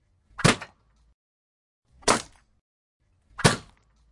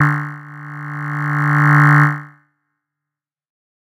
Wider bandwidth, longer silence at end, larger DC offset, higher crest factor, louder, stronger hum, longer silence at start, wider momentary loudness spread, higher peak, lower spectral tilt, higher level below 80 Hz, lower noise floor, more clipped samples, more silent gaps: first, 11.5 kHz vs 7.6 kHz; second, 0.5 s vs 1.55 s; neither; first, 28 dB vs 16 dB; second, -24 LUFS vs -14 LUFS; neither; first, 0.4 s vs 0 s; first, 23 LU vs 20 LU; about the same, -2 dBFS vs 0 dBFS; second, -3.5 dB/octave vs -8 dB/octave; first, -50 dBFS vs -64 dBFS; second, -59 dBFS vs -86 dBFS; neither; first, 1.14-1.82 s, 2.61-3.00 s vs none